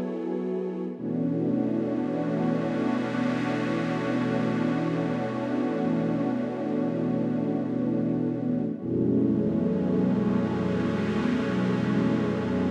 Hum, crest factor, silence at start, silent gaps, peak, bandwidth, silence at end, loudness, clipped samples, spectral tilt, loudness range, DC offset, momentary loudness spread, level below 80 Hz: none; 14 dB; 0 s; none; -14 dBFS; 8.6 kHz; 0 s; -27 LUFS; under 0.1%; -8.5 dB/octave; 2 LU; under 0.1%; 4 LU; -60 dBFS